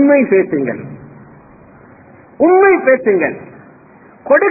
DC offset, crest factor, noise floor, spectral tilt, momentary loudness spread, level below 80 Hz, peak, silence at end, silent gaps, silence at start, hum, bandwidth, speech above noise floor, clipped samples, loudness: under 0.1%; 14 dB; -42 dBFS; -13 dB/octave; 21 LU; -56 dBFS; 0 dBFS; 0 s; none; 0 s; none; 2.7 kHz; 31 dB; under 0.1%; -12 LUFS